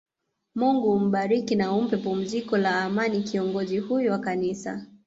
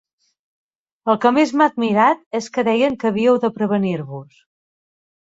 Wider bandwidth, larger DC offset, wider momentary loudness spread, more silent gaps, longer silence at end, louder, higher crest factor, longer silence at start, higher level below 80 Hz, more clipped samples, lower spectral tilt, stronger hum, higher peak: about the same, 7.8 kHz vs 7.8 kHz; neither; second, 6 LU vs 10 LU; second, none vs 2.26-2.31 s; second, 0.2 s vs 1 s; second, -25 LUFS vs -18 LUFS; about the same, 14 dB vs 18 dB; second, 0.55 s vs 1.05 s; about the same, -66 dBFS vs -62 dBFS; neither; about the same, -6.5 dB/octave vs -6 dB/octave; neither; second, -12 dBFS vs -2 dBFS